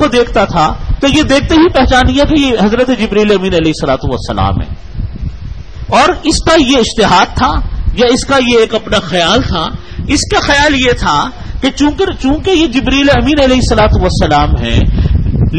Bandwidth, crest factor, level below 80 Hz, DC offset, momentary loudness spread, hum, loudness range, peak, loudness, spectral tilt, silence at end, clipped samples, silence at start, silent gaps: 10.5 kHz; 10 dB; -18 dBFS; 3%; 9 LU; none; 3 LU; 0 dBFS; -10 LUFS; -5 dB/octave; 0 s; under 0.1%; 0 s; none